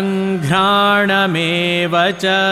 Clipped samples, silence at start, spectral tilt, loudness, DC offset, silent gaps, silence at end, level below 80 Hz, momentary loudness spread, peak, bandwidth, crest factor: under 0.1%; 0 s; -5 dB/octave; -14 LUFS; under 0.1%; none; 0 s; -52 dBFS; 4 LU; -4 dBFS; 14.5 kHz; 12 dB